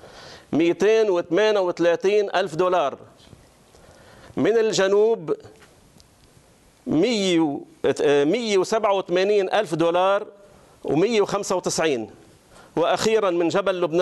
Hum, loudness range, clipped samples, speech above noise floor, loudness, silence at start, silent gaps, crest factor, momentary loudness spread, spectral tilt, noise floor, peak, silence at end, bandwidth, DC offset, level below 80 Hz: none; 3 LU; under 0.1%; 34 dB; -21 LUFS; 0.05 s; none; 14 dB; 9 LU; -4.5 dB/octave; -54 dBFS; -8 dBFS; 0 s; 12 kHz; under 0.1%; -62 dBFS